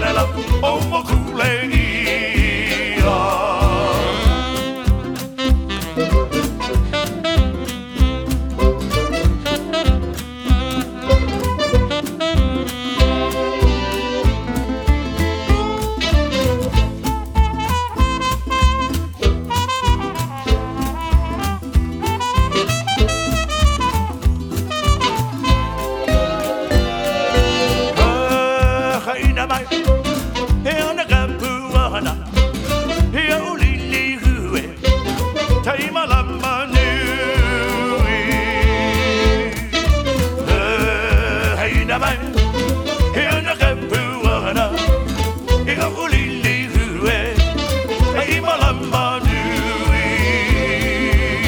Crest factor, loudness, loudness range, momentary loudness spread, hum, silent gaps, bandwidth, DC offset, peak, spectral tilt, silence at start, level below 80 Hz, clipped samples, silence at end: 16 dB; -18 LUFS; 2 LU; 5 LU; none; none; over 20 kHz; under 0.1%; 0 dBFS; -5 dB/octave; 0 s; -20 dBFS; under 0.1%; 0 s